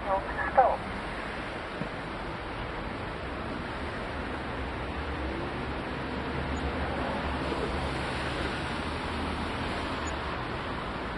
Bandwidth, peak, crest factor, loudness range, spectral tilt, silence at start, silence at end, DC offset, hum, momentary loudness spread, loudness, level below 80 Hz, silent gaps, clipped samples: 11.5 kHz; -8 dBFS; 24 dB; 4 LU; -5.5 dB/octave; 0 s; 0 s; under 0.1%; none; 6 LU; -33 LUFS; -42 dBFS; none; under 0.1%